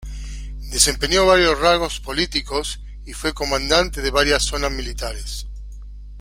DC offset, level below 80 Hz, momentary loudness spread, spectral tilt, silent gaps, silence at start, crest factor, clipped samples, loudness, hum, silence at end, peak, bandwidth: under 0.1%; -30 dBFS; 19 LU; -2.5 dB/octave; none; 0 s; 20 dB; under 0.1%; -19 LUFS; 50 Hz at -30 dBFS; 0 s; 0 dBFS; 16.5 kHz